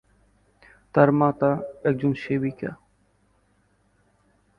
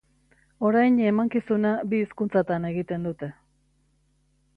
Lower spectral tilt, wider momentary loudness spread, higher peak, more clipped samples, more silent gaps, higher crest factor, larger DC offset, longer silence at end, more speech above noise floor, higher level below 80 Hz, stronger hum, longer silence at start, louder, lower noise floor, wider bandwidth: about the same, -10 dB/octave vs -9.5 dB/octave; about the same, 11 LU vs 11 LU; first, -2 dBFS vs -10 dBFS; neither; neither; first, 24 dB vs 16 dB; neither; first, 1.85 s vs 1.25 s; about the same, 43 dB vs 43 dB; about the same, -60 dBFS vs -62 dBFS; first, 50 Hz at -60 dBFS vs none; first, 0.95 s vs 0.6 s; about the same, -23 LUFS vs -24 LUFS; about the same, -65 dBFS vs -66 dBFS; first, 5.8 kHz vs 4.8 kHz